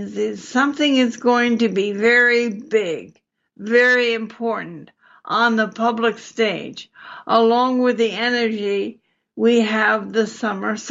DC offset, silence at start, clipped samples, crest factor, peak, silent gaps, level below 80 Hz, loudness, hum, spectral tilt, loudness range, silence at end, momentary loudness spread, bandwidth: under 0.1%; 0 s; under 0.1%; 16 dB; -4 dBFS; none; -74 dBFS; -18 LUFS; none; -4.5 dB/octave; 3 LU; 0 s; 12 LU; 7.8 kHz